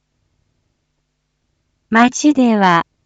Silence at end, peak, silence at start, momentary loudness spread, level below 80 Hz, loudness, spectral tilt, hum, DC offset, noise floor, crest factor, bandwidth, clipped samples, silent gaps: 0.25 s; 0 dBFS; 1.9 s; 2 LU; -60 dBFS; -13 LUFS; -4.5 dB/octave; none; under 0.1%; -69 dBFS; 16 dB; 8 kHz; under 0.1%; none